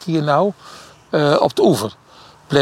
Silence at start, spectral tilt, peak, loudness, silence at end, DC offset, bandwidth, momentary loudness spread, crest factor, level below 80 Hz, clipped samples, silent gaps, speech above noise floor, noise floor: 0 s; -6 dB/octave; -2 dBFS; -17 LUFS; 0 s; under 0.1%; 16.5 kHz; 10 LU; 16 dB; -56 dBFS; under 0.1%; none; 25 dB; -42 dBFS